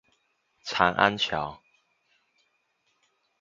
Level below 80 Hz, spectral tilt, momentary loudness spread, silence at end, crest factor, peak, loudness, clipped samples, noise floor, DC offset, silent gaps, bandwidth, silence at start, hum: -60 dBFS; -4 dB/octave; 15 LU; 1.85 s; 28 dB; -4 dBFS; -25 LUFS; under 0.1%; -73 dBFS; under 0.1%; none; 7.6 kHz; 0.65 s; none